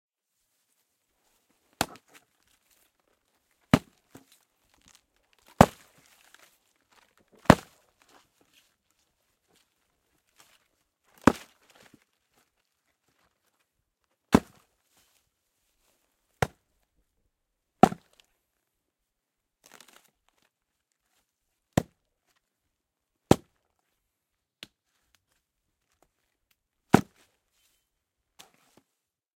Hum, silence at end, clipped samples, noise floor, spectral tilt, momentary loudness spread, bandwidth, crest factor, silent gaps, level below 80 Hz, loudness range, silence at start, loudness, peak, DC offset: none; 2.4 s; under 0.1%; -84 dBFS; -6 dB/octave; 23 LU; 16.5 kHz; 34 dB; none; -54 dBFS; 10 LU; 1.8 s; -26 LUFS; 0 dBFS; under 0.1%